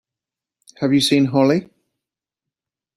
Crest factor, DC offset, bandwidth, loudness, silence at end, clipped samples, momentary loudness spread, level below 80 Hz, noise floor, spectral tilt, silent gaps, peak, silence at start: 18 dB; under 0.1%; 14 kHz; -17 LUFS; 1.35 s; under 0.1%; 7 LU; -62 dBFS; -87 dBFS; -5.5 dB/octave; none; -2 dBFS; 0.8 s